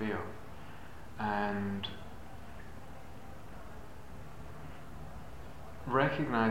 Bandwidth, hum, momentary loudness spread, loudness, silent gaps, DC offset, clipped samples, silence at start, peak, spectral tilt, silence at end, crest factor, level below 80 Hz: 16 kHz; none; 20 LU; -36 LUFS; none; 0.6%; under 0.1%; 0 s; -12 dBFS; -6.5 dB/octave; 0 s; 26 dB; -54 dBFS